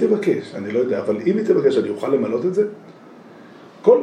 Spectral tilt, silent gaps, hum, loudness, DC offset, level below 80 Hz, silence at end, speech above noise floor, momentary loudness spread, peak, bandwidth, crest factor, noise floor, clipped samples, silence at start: -7.5 dB/octave; none; none; -20 LUFS; under 0.1%; -76 dBFS; 0 s; 23 dB; 8 LU; -2 dBFS; 9.8 kHz; 16 dB; -43 dBFS; under 0.1%; 0 s